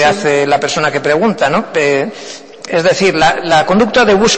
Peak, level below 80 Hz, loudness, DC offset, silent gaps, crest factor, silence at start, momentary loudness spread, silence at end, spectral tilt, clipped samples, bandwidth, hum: -2 dBFS; -42 dBFS; -12 LUFS; under 0.1%; none; 10 dB; 0 s; 9 LU; 0 s; -4 dB/octave; under 0.1%; 8.8 kHz; none